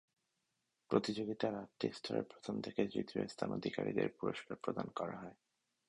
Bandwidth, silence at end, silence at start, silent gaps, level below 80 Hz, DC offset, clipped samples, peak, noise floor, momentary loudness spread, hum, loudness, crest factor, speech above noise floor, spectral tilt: 11 kHz; 0.55 s; 0.9 s; none; -74 dBFS; under 0.1%; under 0.1%; -18 dBFS; -86 dBFS; 7 LU; none; -41 LUFS; 22 dB; 46 dB; -6 dB/octave